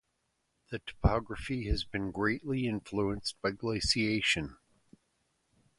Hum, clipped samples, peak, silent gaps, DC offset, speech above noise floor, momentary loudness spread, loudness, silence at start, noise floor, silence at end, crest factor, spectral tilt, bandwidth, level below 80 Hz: none; under 0.1%; -12 dBFS; none; under 0.1%; 47 dB; 9 LU; -32 LUFS; 0.7 s; -79 dBFS; 1.25 s; 22 dB; -4.5 dB/octave; 11.5 kHz; -42 dBFS